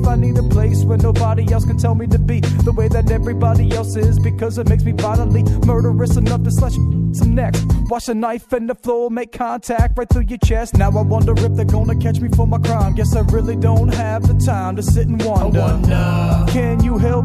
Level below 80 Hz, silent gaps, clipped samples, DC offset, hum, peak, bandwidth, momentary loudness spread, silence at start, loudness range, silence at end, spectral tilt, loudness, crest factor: -20 dBFS; none; under 0.1%; under 0.1%; none; 0 dBFS; 14 kHz; 4 LU; 0 s; 3 LU; 0 s; -7.5 dB/octave; -16 LUFS; 14 dB